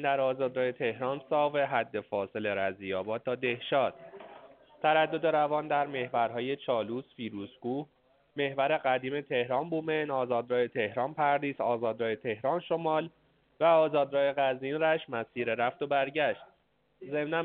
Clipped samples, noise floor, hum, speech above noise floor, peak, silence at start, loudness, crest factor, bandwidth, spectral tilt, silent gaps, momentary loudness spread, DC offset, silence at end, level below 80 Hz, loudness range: under 0.1%; -71 dBFS; none; 41 dB; -12 dBFS; 0 s; -30 LUFS; 18 dB; 4.5 kHz; -3 dB/octave; none; 9 LU; under 0.1%; 0 s; -76 dBFS; 4 LU